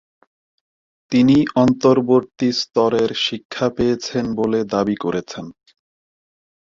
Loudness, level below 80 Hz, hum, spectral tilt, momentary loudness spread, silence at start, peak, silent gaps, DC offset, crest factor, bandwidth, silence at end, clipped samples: -18 LUFS; -52 dBFS; none; -6 dB/octave; 9 LU; 1.1 s; -2 dBFS; 3.45-3.50 s; under 0.1%; 18 dB; 7.6 kHz; 1.15 s; under 0.1%